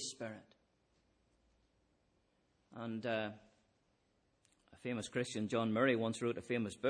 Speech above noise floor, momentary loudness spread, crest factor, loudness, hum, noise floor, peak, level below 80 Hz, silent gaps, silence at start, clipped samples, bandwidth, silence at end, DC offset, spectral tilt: 40 dB; 15 LU; 22 dB; -39 LUFS; none; -78 dBFS; -20 dBFS; -78 dBFS; none; 0 s; under 0.1%; 10.5 kHz; 0 s; under 0.1%; -5 dB/octave